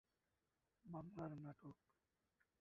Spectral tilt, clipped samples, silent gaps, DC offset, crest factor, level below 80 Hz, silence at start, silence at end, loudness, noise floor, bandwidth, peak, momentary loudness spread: -9 dB/octave; under 0.1%; none; under 0.1%; 22 dB; -82 dBFS; 0.85 s; 0.85 s; -56 LUFS; under -90 dBFS; 5.6 kHz; -36 dBFS; 11 LU